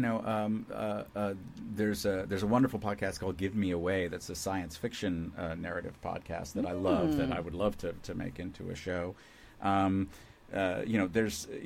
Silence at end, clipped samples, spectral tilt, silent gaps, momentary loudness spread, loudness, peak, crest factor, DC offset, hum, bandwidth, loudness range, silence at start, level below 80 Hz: 0 s; under 0.1%; -6 dB/octave; none; 11 LU; -34 LUFS; -14 dBFS; 18 dB; under 0.1%; none; 16.5 kHz; 3 LU; 0 s; -54 dBFS